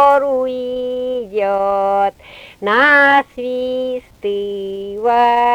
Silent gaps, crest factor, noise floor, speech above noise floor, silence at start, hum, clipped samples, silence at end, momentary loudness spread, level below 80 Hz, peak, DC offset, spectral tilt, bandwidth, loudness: none; 14 dB; -39 dBFS; 24 dB; 0 s; none; under 0.1%; 0 s; 13 LU; -52 dBFS; -2 dBFS; under 0.1%; -4.5 dB/octave; 16.5 kHz; -16 LUFS